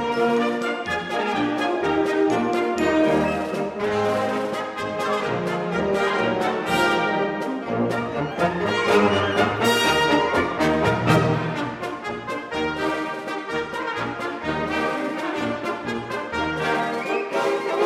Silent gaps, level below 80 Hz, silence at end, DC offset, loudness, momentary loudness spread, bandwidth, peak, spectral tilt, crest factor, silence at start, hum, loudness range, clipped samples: none; -50 dBFS; 0 s; under 0.1%; -23 LUFS; 8 LU; 16 kHz; -4 dBFS; -5 dB/octave; 20 dB; 0 s; none; 6 LU; under 0.1%